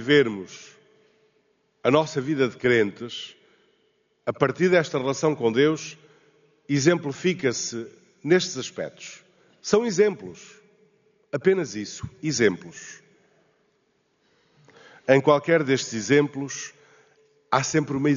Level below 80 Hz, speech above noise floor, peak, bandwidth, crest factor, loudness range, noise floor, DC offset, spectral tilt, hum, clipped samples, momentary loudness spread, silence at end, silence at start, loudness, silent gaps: -66 dBFS; 46 dB; -4 dBFS; 7.4 kHz; 22 dB; 4 LU; -69 dBFS; under 0.1%; -4.5 dB/octave; none; under 0.1%; 17 LU; 0 s; 0 s; -23 LUFS; none